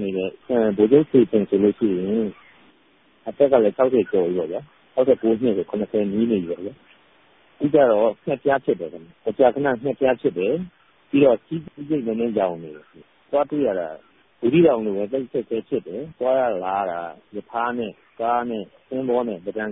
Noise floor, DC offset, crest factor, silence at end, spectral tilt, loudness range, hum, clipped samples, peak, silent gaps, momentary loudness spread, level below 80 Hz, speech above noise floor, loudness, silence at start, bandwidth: -58 dBFS; under 0.1%; 20 dB; 0 s; -11.5 dB/octave; 4 LU; none; under 0.1%; -2 dBFS; none; 14 LU; -60 dBFS; 37 dB; -21 LUFS; 0 s; 3.9 kHz